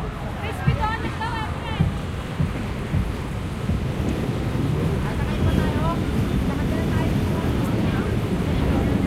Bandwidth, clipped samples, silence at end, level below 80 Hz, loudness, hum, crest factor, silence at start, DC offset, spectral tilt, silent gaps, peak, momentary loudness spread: 16 kHz; under 0.1%; 0 s; -30 dBFS; -24 LUFS; none; 16 dB; 0 s; under 0.1%; -7 dB/octave; none; -6 dBFS; 6 LU